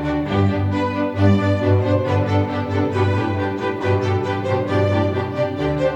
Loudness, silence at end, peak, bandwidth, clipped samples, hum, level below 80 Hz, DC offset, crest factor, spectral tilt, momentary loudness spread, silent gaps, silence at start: -19 LUFS; 0 s; -2 dBFS; 7.6 kHz; under 0.1%; none; -44 dBFS; under 0.1%; 16 dB; -8 dB/octave; 4 LU; none; 0 s